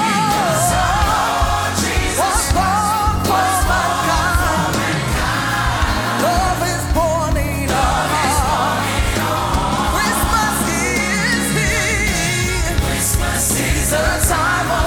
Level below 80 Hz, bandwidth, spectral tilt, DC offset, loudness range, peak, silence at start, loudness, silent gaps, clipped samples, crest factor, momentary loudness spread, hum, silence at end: -24 dBFS; 18.5 kHz; -3.5 dB/octave; under 0.1%; 1 LU; -2 dBFS; 0 s; -16 LUFS; none; under 0.1%; 14 dB; 2 LU; none; 0 s